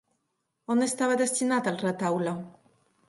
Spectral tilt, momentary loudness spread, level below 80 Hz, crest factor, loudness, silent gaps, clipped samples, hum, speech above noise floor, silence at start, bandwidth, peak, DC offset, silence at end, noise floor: -4.5 dB/octave; 13 LU; -74 dBFS; 16 dB; -27 LUFS; none; under 0.1%; none; 52 dB; 0.7 s; 11.5 kHz; -14 dBFS; under 0.1%; 0.55 s; -79 dBFS